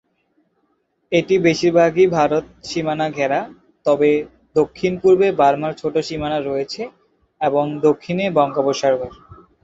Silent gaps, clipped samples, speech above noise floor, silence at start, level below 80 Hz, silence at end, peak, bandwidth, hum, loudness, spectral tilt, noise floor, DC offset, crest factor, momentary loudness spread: none; under 0.1%; 49 dB; 1.1 s; -52 dBFS; 0.3 s; -2 dBFS; 8 kHz; none; -18 LUFS; -6 dB/octave; -66 dBFS; under 0.1%; 16 dB; 9 LU